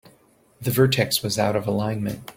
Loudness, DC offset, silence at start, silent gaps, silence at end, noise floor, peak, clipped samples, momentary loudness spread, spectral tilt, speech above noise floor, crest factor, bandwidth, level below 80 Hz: -22 LUFS; under 0.1%; 0.6 s; none; 0.05 s; -58 dBFS; -4 dBFS; under 0.1%; 8 LU; -5 dB/octave; 36 dB; 20 dB; 17 kHz; -54 dBFS